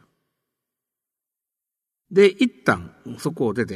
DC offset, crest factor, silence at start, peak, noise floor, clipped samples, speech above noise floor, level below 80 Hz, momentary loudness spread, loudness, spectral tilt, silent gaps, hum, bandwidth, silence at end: under 0.1%; 20 dB; 2.1 s; -4 dBFS; -87 dBFS; under 0.1%; 67 dB; -62 dBFS; 13 LU; -21 LUFS; -6 dB/octave; none; none; 13.5 kHz; 0 s